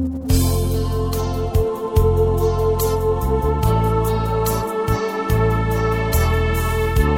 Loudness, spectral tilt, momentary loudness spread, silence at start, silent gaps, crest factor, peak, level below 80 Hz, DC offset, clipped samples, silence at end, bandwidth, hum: -19 LUFS; -6.5 dB/octave; 4 LU; 0 s; none; 14 dB; -4 dBFS; -24 dBFS; under 0.1%; under 0.1%; 0 s; 17 kHz; none